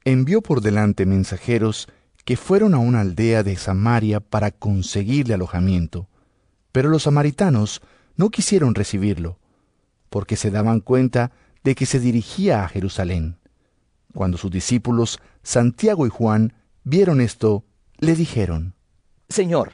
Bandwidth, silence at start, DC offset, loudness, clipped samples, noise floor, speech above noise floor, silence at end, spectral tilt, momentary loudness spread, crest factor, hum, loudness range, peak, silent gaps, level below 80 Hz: 11 kHz; 0.05 s; under 0.1%; -20 LUFS; under 0.1%; -64 dBFS; 46 dB; 0.05 s; -6.5 dB/octave; 10 LU; 16 dB; none; 3 LU; -4 dBFS; none; -46 dBFS